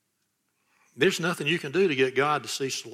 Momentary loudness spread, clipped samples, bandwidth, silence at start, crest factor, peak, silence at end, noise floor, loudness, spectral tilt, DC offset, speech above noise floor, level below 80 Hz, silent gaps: 5 LU; under 0.1%; 15.5 kHz; 0.95 s; 18 dB; -10 dBFS; 0 s; -76 dBFS; -25 LUFS; -4 dB/octave; under 0.1%; 50 dB; -74 dBFS; none